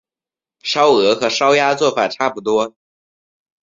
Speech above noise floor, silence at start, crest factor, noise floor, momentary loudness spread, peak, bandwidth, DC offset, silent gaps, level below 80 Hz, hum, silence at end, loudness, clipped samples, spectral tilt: over 75 dB; 0.65 s; 16 dB; under -90 dBFS; 8 LU; -2 dBFS; 7.8 kHz; under 0.1%; none; -62 dBFS; none; 0.95 s; -15 LUFS; under 0.1%; -3 dB/octave